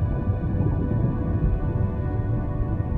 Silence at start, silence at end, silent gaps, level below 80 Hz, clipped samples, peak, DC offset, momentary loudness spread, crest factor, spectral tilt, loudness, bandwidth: 0 s; 0 s; none; -30 dBFS; under 0.1%; -10 dBFS; under 0.1%; 3 LU; 14 dB; -12 dB/octave; -25 LUFS; 3.7 kHz